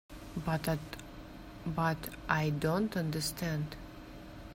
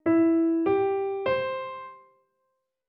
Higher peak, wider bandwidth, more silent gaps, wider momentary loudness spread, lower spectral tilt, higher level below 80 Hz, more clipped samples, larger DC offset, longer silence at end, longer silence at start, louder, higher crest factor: about the same, -12 dBFS vs -14 dBFS; first, 16 kHz vs 5.2 kHz; neither; about the same, 17 LU vs 16 LU; second, -5.5 dB/octave vs -9.5 dB/octave; first, -52 dBFS vs -68 dBFS; neither; neither; second, 0 s vs 0.9 s; about the same, 0.1 s vs 0.05 s; second, -35 LUFS vs -25 LUFS; first, 24 dB vs 12 dB